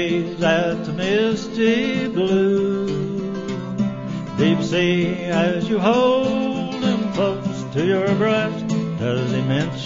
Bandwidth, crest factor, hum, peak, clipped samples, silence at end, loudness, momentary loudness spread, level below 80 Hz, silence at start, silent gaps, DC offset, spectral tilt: 7.6 kHz; 16 dB; none; -4 dBFS; under 0.1%; 0 s; -20 LUFS; 7 LU; -52 dBFS; 0 s; none; under 0.1%; -6.5 dB/octave